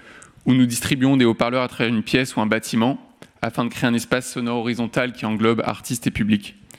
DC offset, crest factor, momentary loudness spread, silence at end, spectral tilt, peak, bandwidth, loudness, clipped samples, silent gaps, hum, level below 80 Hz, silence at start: under 0.1%; 16 dB; 7 LU; 0.3 s; -5 dB/octave; -4 dBFS; 16 kHz; -21 LUFS; under 0.1%; none; none; -50 dBFS; 0.05 s